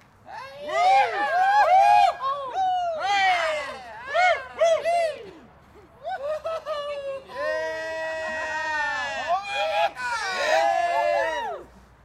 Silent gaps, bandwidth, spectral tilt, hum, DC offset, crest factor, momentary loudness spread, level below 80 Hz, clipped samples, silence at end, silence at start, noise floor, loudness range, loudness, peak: none; 13.5 kHz; -1.5 dB/octave; none; under 0.1%; 14 dB; 15 LU; -60 dBFS; under 0.1%; 0.4 s; 0.25 s; -51 dBFS; 9 LU; -23 LUFS; -10 dBFS